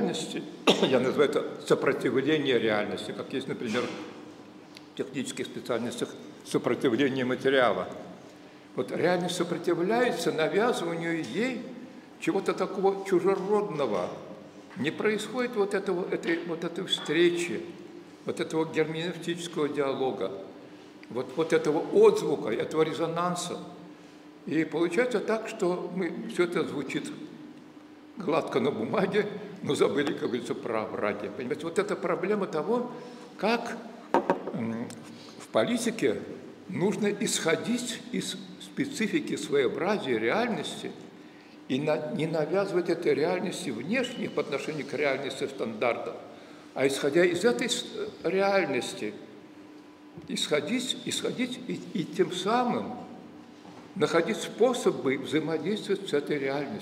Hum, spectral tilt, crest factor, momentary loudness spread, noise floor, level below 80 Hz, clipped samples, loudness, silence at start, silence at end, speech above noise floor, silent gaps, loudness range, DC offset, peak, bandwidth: none; -4.5 dB/octave; 22 dB; 18 LU; -50 dBFS; -78 dBFS; under 0.1%; -29 LUFS; 0 s; 0 s; 21 dB; none; 4 LU; under 0.1%; -8 dBFS; 16 kHz